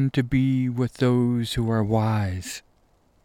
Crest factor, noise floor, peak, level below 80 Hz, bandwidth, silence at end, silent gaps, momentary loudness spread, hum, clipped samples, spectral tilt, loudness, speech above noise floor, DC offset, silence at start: 14 dB; -62 dBFS; -10 dBFS; -46 dBFS; 16 kHz; 0.65 s; none; 9 LU; none; under 0.1%; -7 dB/octave; -23 LUFS; 39 dB; under 0.1%; 0 s